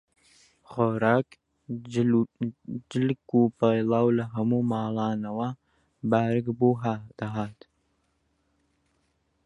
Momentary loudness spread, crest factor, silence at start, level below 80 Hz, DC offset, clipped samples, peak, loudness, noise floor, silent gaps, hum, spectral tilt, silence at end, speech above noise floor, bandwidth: 12 LU; 20 dB; 0.7 s; -64 dBFS; under 0.1%; under 0.1%; -6 dBFS; -26 LUFS; -72 dBFS; none; none; -8.5 dB/octave; 1.95 s; 47 dB; 8.4 kHz